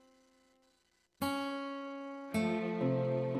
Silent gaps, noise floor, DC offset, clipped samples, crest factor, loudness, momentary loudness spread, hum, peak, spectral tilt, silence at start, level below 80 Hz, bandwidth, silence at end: none; -75 dBFS; under 0.1%; under 0.1%; 16 dB; -36 LUFS; 10 LU; none; -20 dBFS; -6.5 dB/octave; 1.2 s; -70 dBFS; 15.5 kHz; 0 s